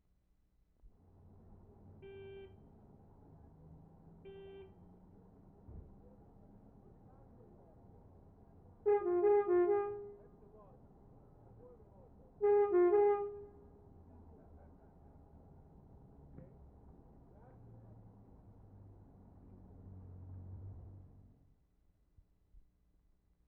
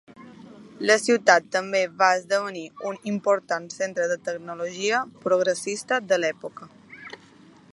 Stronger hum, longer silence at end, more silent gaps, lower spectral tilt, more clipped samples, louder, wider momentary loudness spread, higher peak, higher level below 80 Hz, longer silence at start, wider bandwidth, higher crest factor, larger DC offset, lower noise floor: neither; first, 2.5 s vs 0.6 s; neither; first, -8.5 dB/octave vs -3 dB/octave; neither; second, -33 LUFS vs -24 LUFS; first, 30 LU vs 17 LU; second, -22 dBFS vs -2 dBFS; first, -64 dBFS vs -76 dBFS; first, 2.05 s vs 0.2 s; second, 3.3 kHz vs 11.5 kHz; about the same, 20 dB vs 24 dB; neither; first, -74 dBFS vs -52 dBFS